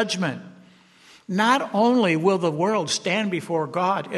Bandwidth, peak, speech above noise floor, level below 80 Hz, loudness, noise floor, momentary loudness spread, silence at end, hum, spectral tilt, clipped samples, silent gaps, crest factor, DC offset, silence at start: 12.5 kHz; -6 dBFS; 31 dB; -72 dBFS; -22 LUFS; -52 dBFS; 7 LU; 0 s; none; -4.5 dB/octave; under 0.1%; none; 16 dB; under 0.1%; 0 s